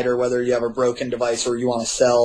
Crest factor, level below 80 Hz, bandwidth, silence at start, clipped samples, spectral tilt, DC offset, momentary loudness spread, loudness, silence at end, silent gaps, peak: 16 dB; -52 dBFS; 11 kHz; 0 s; under 0.1%; -4 dB/octave; under 0.1%; 3 LU; -21 LUFS; 0 s; none; -4 dBFS